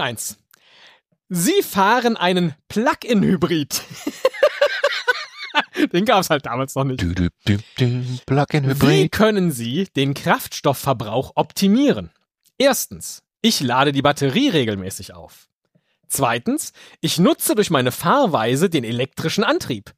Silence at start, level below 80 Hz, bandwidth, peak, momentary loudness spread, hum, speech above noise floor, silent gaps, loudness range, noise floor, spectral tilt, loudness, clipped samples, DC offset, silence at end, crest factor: 0 s; -48 dBFS; 15.5 kHz; -2 dBFS; 9 LU; none; 46 dB; 15.55-15.59 s; 2 LU; -65 dBFS; -4.5 dB/octave; -19 LUFS; under 0.1%; under 0.1%; 0.1 s; 18 dB